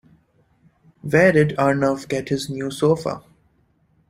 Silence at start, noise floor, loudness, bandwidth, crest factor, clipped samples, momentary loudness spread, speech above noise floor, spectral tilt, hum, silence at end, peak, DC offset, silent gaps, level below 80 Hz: 1.05 s; -62 dBFS; -20 LUFS; 15.5 kHz; 20 dB; under 0.1%; 13 LU; 43 dB; -6.5 dB/octave; none; 0.9 s; -2 dBFS; under 0.1%; none; -54 dBFS